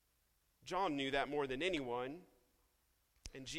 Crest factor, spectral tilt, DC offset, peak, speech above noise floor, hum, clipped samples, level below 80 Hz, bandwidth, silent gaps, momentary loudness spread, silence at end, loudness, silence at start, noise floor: 20 dB; -4 dB/octave; under 0.1%; -24 dBFS; 38 dB; none; under 0.1%; -66 dBFS; 16 kHz; none; 18 LU; 0 s; -40 LUFS; 0.65 s; -78 dBFS